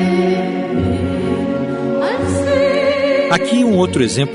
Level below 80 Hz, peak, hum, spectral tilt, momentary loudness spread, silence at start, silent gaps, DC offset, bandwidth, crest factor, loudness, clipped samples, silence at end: -42 dBFS; -2 dBFS; none; -6 dB/octave; 5 LU; 0 s; none; under 0.1%; 11 kHz; 14 dB; -16 LUFS; under 0.1%; 0 s